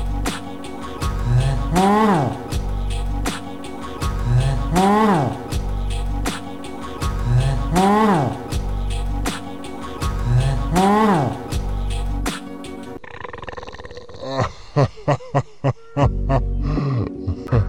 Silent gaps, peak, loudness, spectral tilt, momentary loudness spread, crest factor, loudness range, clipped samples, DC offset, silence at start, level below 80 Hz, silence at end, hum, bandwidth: none; -4 dBFS; -21 LUFS; -6.5 dB/octave; 16 LU; 16 dB; 4 LU; under 0.1%; under 0.1%; 0 s; -26 dBFS; 0 s; none; 15.5 kHz